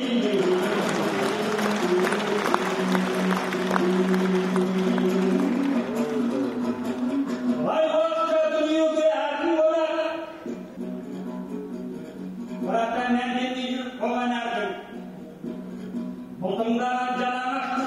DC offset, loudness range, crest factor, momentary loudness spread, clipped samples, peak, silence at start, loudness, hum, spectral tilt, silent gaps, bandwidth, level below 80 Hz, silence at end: under 0.1%; 6 LU; 20 dB; 13 LU; under 0.1%; -4 dBFS; 0 s; -25 LUFS; none; -5.5 dB/octave; none; 15 kHz; -64 dBFS; 0 s